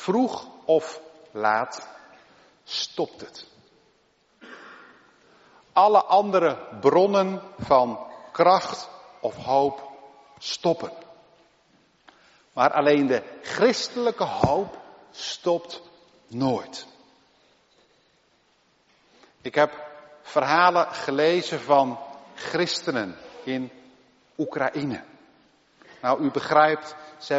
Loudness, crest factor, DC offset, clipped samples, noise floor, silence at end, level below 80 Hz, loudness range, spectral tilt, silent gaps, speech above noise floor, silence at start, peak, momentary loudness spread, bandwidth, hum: -23 LUFS; 22 dB; under 0.1%; under 0.1%; -64 dBFS; 0 s; -60 dBFS; 11 LU; -3 dB/octave; none; 41 dB; 0 s; -4 dBFS; 21 LU; 8 kHz; none